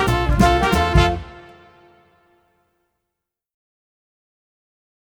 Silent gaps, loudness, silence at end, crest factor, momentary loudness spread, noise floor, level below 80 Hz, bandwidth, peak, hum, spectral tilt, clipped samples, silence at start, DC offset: none; -17 LUFS; 3.65 s; 20 dB; 12 LU; -82 dBFS; -28 dBFS; 20 kHz; -2 dBFS; none; -6 dB/octave; under 0.1%; 0 s; under 0.1%